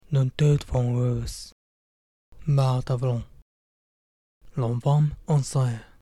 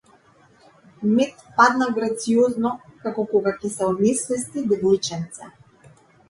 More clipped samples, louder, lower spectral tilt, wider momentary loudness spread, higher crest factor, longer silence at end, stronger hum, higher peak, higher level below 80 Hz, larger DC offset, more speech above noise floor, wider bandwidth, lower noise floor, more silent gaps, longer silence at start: neither; second, -25 LUFS vs -21 LUFS; first, -7.5 dB/octave vs -4.5 dB/octave; about the same, 13 LU vs 11 LU; second, 14 dB vs 22 dB; second, 0.2 s vs 0.8 s; neither; second, -10 dBFS vs -2 dBFS; first, -46 dBFS vs -62 dBFS; neither; first, over 67 dB vs 34 dB; about the same, 12 kHz vs 11.5 kHz; first, under -90 dBFS vs -55 dBFS; first, 1.52-2.32 s, 3.42-4.41 s vs none; second, 0.1 s vs 1 s